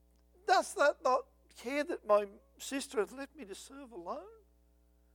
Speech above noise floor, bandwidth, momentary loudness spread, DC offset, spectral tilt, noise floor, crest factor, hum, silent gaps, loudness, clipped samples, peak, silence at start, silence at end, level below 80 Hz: 33 dB; 18 kHz; 17 LU; under 0.1%; -2.5 dB/octave; -67 dBFS; 20 dB; 60 Hz at -70 dBFS; none; -34 LUFS; under 0.1%; -16 dBFS; 0.45 s; 0.8 s; -68 dBFS